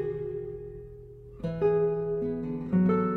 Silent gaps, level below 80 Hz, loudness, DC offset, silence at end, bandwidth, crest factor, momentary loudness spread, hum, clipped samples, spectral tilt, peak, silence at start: none; -52 dBFS; -29 LUFS; under 0.1%; 0 s; 4.4 kHz; 14 dB; 20 LU; none; under 0.1%; -11 dB/octave; -14 dBFS; 0 s